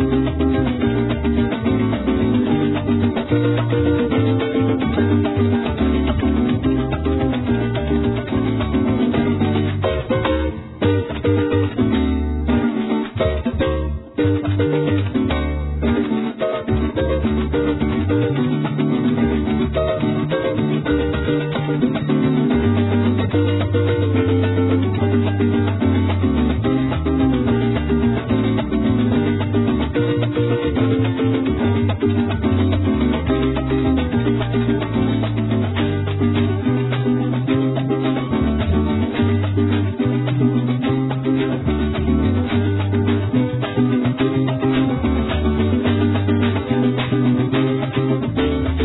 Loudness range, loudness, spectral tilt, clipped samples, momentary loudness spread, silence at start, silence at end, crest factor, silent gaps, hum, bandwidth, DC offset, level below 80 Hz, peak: 2 LU; -19 LUFS; -11.5 dB/octave; under 0.1%; 3 LU; 0 s; 0 s; 12 dB; none; none; 4.1 kHz; under 0.1%; -30 dBFS; -6 dBFS